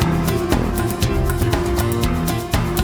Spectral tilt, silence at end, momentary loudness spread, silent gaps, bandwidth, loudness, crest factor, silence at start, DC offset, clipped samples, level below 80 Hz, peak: -5.5 dB/octave; 0 s; 2 LU; none; over 20 kHz; -20 LUFS; 16 dB; 0 s; under 0.1%; under 0.1%; -26 dBFS; -2 dBFS